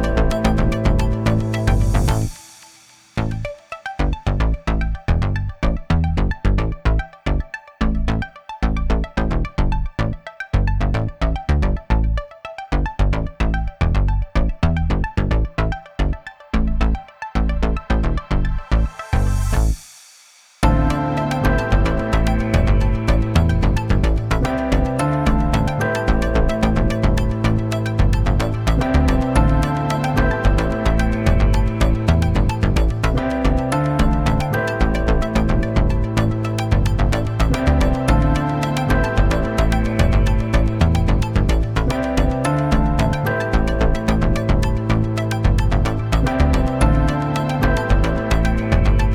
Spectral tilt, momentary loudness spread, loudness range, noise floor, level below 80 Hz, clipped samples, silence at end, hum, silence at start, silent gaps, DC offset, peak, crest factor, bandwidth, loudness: -7 dB/octave; 6 LU; 4 LU; -49 dBFS; -20 dBFS; under 0.1%; 0 s; none; 0 s; none; under 0.1%; 0 dBFS; 16 dB; 13 kHz; -20 LUFS